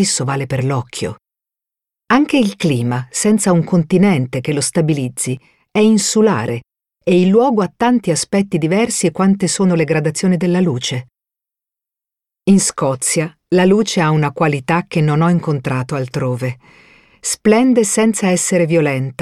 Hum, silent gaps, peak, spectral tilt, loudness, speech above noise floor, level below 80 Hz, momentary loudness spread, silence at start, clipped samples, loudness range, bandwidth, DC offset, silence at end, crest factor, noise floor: none; none; 0 dBFS; -5 dB/octave; -15 LUFS; 72 dB; -52 dBFS; 9 LU; 0 s; under 0.1%; 3 LU; 14 kHz; under 0.1%; 0.1 s; 14 dB; -87 dBFS